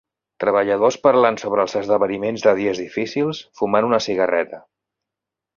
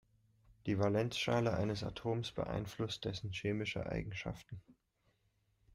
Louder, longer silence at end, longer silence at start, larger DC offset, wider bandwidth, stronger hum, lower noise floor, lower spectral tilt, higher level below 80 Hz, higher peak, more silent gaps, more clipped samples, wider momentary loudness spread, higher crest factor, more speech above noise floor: first, -19 LUFS vs -38 LUFS; about the same, 1 s vs 1.05 s; second, 0.4 s vs 0.65 s; neither; second, 7.2 kHz vs 15.5 kHz; neither; first, -85 dBFS vs -78 dBFS; about the same, -5 dB/octave vs -6 dB/octave; about the same, -60 dBFS vs -60 dBFS; first, -2 dBFS vs -22 dBFS; neither; neither; about the same, 9 LU vs 11 LU; about the same, 18 dB vs 18 dB; first, 67 dB vs 40 dB